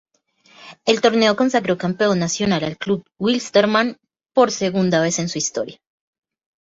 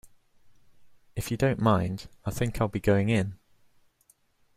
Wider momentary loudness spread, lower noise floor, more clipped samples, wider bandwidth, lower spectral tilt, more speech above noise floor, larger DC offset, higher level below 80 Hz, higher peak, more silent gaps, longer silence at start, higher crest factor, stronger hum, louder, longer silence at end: second, 8 LU vs 12 LU; second, -56 dBFS vs -66 dBFS; neither; second, 8 kHz vs 16 kHz; second, -4 dB/octave vs -6.5 dB/octave; about the same, 38 dB vs 40 dB; neither; second, -58 dBFS vs -48 dBFS; first, -2 dBFS vs -10 dBFS; neither; first, 0.6 s vs 0.05 s; about the same, 18 dB vs 20 dB; neither; first, -19 LUFS vs -28 LUFS; second, 0.9 s vs 1.2 s